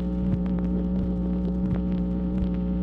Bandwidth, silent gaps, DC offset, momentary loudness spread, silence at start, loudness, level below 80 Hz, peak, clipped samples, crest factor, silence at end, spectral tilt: 4.1 kHz; none; under 0.1%; 1 LU; 0 s; -26 LUFS; -32 dBFS; -14 dBFS; under 0.1%; 10 dB; 0 s; -11.5 dB/octave